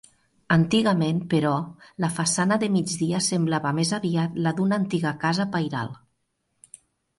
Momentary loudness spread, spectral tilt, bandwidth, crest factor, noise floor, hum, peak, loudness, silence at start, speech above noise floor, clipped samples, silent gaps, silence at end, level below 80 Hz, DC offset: 8 LU; -5 dB/octave; 11.5 kHz; 18 dB; -74 dBFS; none; -6 dBFS; -24 LUFS; 0.5 s; 51 dB; under 0.1%; none; 1.2 s; -62 dBFS; under 0.1%